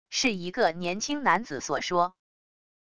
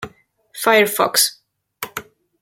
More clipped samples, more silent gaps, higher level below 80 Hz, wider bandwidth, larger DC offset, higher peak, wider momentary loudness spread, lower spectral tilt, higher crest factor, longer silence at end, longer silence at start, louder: neither; neither; about the same, -62 dBFS vs -62 dBFS; second, 11 kHz vs 17 kHz; first, 0.4% vs under 0.1%; second, -8 dBFS vs -2 dBFS; second, 6 LU vs 20 LU; first, -3 dB/octave vs -1 dB/octave; about the same, 20 dB vs 20 dB; first, 0.65 s vs 0.4 s; about the same, 0.05 s vs 0 s; second, -27 LUFS vs -16 LUFS